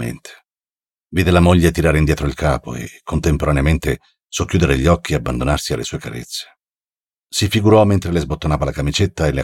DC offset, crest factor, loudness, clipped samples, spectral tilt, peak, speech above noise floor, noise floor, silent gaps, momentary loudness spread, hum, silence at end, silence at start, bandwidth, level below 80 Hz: under 0.1%; 16 dB; -17 LUFS; under 0.1%; -6 dB/octave; -2 dBFS; over 74 dB; under -90 dBFS; none; 14 LU; none; 0 s; 0 s; 17 kHz; -28 dBFS